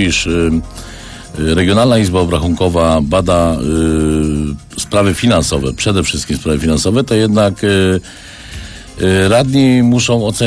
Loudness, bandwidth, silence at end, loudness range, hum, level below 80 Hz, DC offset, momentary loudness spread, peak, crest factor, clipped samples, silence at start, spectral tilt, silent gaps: -13 LUFS; 11 kHz; 0 s; 2 LU; none; -28 dBFS; under 0.1%; 18 LU; 0 dBFS; 12 dB; under 0.1%; 0 s; -5.5 dB/octave; none